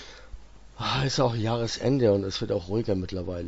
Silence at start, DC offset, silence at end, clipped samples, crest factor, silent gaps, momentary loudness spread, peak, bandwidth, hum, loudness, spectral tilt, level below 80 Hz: 0 s; under 0.1%; 0 s; under 0.1%; 18 dB; none; 8 LU; -10 dBFS; 8 kHz; none; -27 LUFS; -6 dB/octave; -48 dBFS